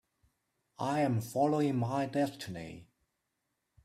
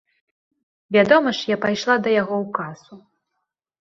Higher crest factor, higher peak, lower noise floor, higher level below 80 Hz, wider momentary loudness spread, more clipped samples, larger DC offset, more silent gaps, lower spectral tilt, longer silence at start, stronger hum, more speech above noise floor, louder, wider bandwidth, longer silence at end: about the same, 18 dB vs 22 dB; second, -18 dBFS vs 0 dBFS; first, -83 dBFS vs -78 dBFS; second, -70 dBFS vs -64 dBFS; first, 15 LU vs 12 LU; neither; neither; neither; first, -7 dB/octave vs -5 dB/octave; about the same, 0.8 s vs 0.9 s; neither; second, 51 dB vs 59 dB; second, -33 LUFS vs -19 LUFS; first, 15 kHz vs 7.6 kHz; first, 1 s vs 0.8 s